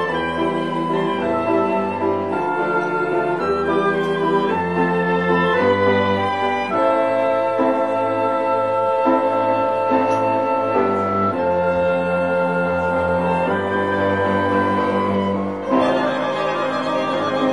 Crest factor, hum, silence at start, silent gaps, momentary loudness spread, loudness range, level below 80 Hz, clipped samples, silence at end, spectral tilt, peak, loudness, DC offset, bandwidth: 14 dB; none; 0 s; none; 4 LU; 2 LU; -52 dBFS; under 0.1%; 0 s; -7 dB/octave; -4 dBFS; -19 LUFS; 0.3%; 10.5 kHz